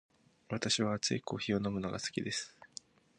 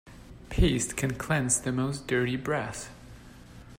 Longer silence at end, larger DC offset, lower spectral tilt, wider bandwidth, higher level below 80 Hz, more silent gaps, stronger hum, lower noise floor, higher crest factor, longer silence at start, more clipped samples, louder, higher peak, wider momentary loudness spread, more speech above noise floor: first, 0.5 s vs 0 s; neither; about the same, -4 dB/octave vs -4.5 dB/octave; second, 11 kHz vs 16 kHz; second, -66 dBFS vs -38 dBFS; neither; neither; first, -55 dBFS vs -49 dBFS; about the same, 20 dB vs 18 dB; first, 0.5 s vs 0.05 s; neither; second, -35 LUFS vs -28 LUFS; second, -16 dBFS vs -10 dBFS; about the same, 17 LU vs 19 LU; about the same, 20 dB vs 20 dB